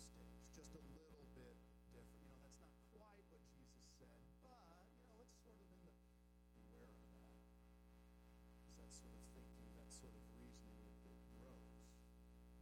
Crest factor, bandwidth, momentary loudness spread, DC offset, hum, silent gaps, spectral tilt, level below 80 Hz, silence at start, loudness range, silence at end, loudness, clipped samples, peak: 16 dB; 16 kHz; 7 LU; under 0.1%; 60 Hz at -65 dBFS; none; -5 dB/octave; -68 dBFS; 0 s; 6 LU; 0 s; -66 LUFS; under 0.1%; -48 dBFS